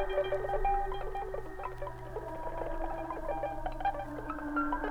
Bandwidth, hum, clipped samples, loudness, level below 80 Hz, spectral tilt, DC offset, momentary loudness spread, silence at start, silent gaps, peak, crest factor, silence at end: 12 kHz; none; under 0.1%; -37 LUFS; -42 dBFS; -7 dB/octave; under 0.1%; 9 LU; 0 s; none; -20 dBFS; 16 dB; 0 s